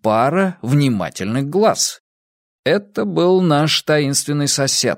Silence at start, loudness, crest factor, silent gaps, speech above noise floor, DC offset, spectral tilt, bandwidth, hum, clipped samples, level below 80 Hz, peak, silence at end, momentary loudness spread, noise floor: 0.05 s; -17 LUFS; 16 dB; 2.00-2.63 s; over 74 dB; under 0.1%; -4.5 dB/octave; 16 kHz; none; under 0.1%; -58 dBFS; -2 dBFS; 0 s; 7 LU; under -90 dBFS